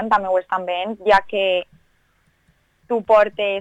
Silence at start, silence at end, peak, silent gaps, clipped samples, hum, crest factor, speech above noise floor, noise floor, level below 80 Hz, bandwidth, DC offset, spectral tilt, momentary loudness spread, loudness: 0 s; 0 s; -4 dBFS; none; under 0.1%; none; 16 dB; 44 dB; -62 dBFS; -54 dBFS; 8.8 kHz; under 0.1%; -5 dB/octave; 10 LU; -19 LUFS